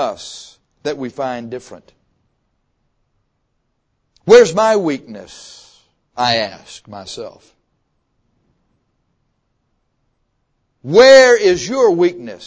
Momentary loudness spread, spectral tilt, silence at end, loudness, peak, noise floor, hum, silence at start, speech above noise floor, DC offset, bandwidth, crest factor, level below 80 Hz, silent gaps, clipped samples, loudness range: 27 LU; -3.5 dB/octave; 0.1 s; -12 LUFS; 0 dBFS; -68 dBFS; none; 0 s; 54 dB; under 0.1%; 8 kHz; 16 dB; -54 dBFS; none; 0.2%; 19 LU